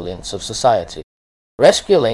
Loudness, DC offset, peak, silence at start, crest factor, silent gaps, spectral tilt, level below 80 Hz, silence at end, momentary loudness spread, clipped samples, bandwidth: -16 LUFS; under 0.1%; 0 dBFS; 0 s; 16 dB; 1.03-1.58 s; -4 dB/octave; -44 dBFS; 0 s; 17 LU; under 0.1%; 12 kHz